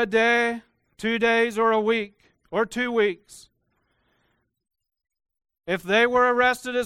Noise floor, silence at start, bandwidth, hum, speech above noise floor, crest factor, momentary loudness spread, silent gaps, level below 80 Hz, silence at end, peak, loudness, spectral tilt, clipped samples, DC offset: -71 dBFS; 0 s; 14 kHz; none; 49 dB; 18 dB; 12 LU; none; -62 dBFS; 0 s; -8 dBFS; -22 LUFS; -4 dB/octave; under 0.1%; under 0.1%